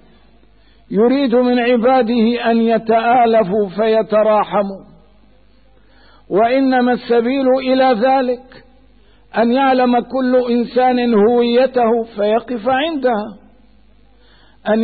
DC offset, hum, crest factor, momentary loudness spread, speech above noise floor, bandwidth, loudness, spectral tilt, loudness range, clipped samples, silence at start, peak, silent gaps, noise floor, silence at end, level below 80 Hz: 0.3%; none; 10 dB; 6 LU; 37 dB; 4.7 kHz; -15 LUFS; -11 dB/octave; 4 LU; under 0.1%; 0.9 s; -4 dBFS; none; -51 dBFS; 0 s; -52 dBFS